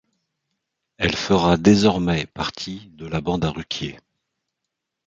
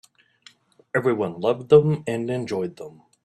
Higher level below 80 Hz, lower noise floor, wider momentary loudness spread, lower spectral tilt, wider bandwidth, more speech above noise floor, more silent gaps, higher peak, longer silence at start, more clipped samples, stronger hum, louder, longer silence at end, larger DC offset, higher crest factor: first, -44 dBFS vs -62 dBFS; first, -81 dBFS vs -55 dBFS; about the same, 16 LU vs 15 LU; second, -5.5 dB/octave vs -7.5 dB/octave; second, 7.8 kHz vs 11.5 kHz; first, 61 dB vs 33 dB; neither; about the same, -2 dBFS vs -2 dBFS; about the same, 1 s vs 0.95 s; neither; neither; about the same, -21 LUFS vs -22 LUFS; first, 1.1 s vs 0.35 s; neither; about the same, 20 dB vs 20 dB